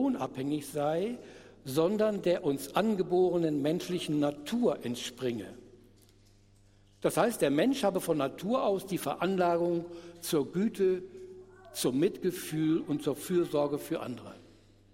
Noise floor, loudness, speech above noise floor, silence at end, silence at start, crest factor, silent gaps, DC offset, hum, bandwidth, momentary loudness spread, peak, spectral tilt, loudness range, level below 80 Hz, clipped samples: -61 dBFS; -31 LUFS; 31 dB; 0.5 s; 0 s; 18 dB; none; under 0.1%; none; 16 kHz; 13 LU; -12 dBFS; -5.5 dB/octave; 3 LU; -66 dBFS; under 0.1%